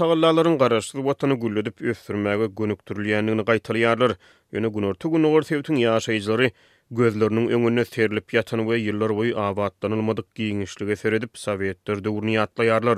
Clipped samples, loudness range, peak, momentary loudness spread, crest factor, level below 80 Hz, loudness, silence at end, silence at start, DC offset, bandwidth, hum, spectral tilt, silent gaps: under 0.1%; 3 LU; -4 dBFS; 8 LU; 18 dB; -62 dBFS; -23 LUFS; 0 s; 0 s; under 0.1%; 14 kHz; none; -6 dB/octave; none